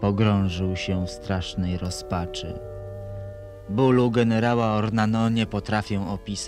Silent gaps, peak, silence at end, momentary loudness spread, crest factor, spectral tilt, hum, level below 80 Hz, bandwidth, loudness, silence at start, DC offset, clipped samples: none; -6 dBFS; 0 s; 16 LU; 18 dB; -6.5 dB/octave; none; -44 dBFS; 12 kHz; -24 LUFS; 0 s; under 0.1%; under 0.1%